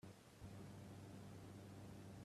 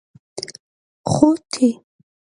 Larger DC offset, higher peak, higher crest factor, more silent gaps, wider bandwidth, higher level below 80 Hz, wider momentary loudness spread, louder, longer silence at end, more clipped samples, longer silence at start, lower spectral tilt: neither; second, -46 dBFS vs 0 dBFS; second, 12 dB vs 20 dB; second, none vs 0.60-1.04 s; first, 14 kHz vs 11 kHz; second, -74 dBFS vs -54 dBFS; second, 2 LU vs 18 LU; second, -58 LUFS vs -18 LUFS; second, 0 s vs 0.6 s; neither; second, 0.05 s vs 0.35 s; about the same, -6 dB/octave vs -6 dB/octave